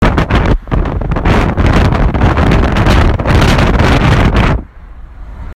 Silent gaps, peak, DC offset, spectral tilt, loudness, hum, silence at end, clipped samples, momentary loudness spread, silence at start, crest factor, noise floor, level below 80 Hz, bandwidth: none; 0 dBFS; 0.3%; -7 dB/octave; -11 LUFS; none; 0 s; under 0.1%; 6 LU; 0 s; 10 dB; -30 dBFS; -14 dBFS; 13 kHz